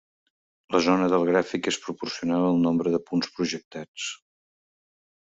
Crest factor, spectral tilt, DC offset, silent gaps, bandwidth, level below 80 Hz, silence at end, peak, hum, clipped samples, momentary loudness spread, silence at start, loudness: 20 dB; -5 dB/octave; under 0.1%; 3.65-3.71 s, 3.88-3.94 s; 8 kHz; -66 dBFS; 1.15 s; -6 dBFS; none; under 0.1%; 12 LU; 0.7 s; -25 LUFS